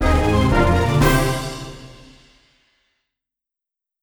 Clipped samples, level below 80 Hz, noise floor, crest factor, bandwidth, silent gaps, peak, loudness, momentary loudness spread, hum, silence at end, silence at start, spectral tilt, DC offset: under 0.1%; -26 dBFS; -87 dBFS; 18 dB; over 20 kHz; none; -2 dBFS; -18 LUFS; 18 LU; none; 2.1 s; 0 s; -6 dB/octave; under 0.1%